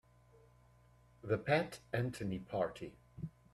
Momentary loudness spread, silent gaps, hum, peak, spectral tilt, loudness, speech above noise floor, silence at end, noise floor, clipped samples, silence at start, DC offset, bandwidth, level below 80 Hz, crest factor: 17 LU; none; 60 Hz at -60 dBFS; -20 dBFS; -6.5 dB/octave; -39 LUFS; 28 dB; 0.25 s; -66 dBFS; under 0.1%; 1.25 s; under 0.1%; 14.5 kHz; -66 dBFS; 22 dB